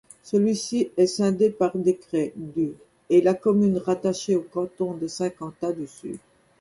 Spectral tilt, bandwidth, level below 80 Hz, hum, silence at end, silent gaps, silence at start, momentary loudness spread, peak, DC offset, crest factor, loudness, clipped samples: -6 dB/octave; 11.5 kHz; -64 dBFS; none; 0.4 s; none; 0.25 s; 10 LU; -8 dBFS; under 0.1%; 16 dB; -24 LUFS; under 0.1%